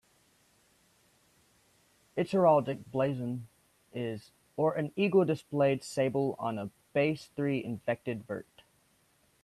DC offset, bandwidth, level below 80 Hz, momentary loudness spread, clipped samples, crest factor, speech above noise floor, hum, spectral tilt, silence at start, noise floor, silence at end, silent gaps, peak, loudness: under 0.1%; 13.5 kHz; -72 dBFS; 14 LU; under 0.1%; 20 dB; 39 dB; none; -7 dB/octave; 2.15 s; -69 dBFS; 1 s; none; -12 dBFS; -31 LUFS